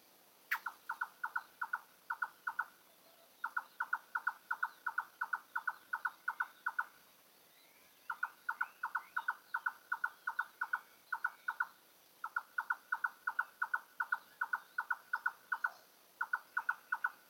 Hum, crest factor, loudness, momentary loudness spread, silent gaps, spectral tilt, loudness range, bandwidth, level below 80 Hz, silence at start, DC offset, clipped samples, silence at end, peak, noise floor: none; 20 dB; -41 LUFS; 4 LU; none; 0 dB/octave; 3 LU; 17 kHz; under -90 dBFS; 0.5 s; under 0.1%; under 0.1%; 0.15 s; -22 dBFS; -66 dBFS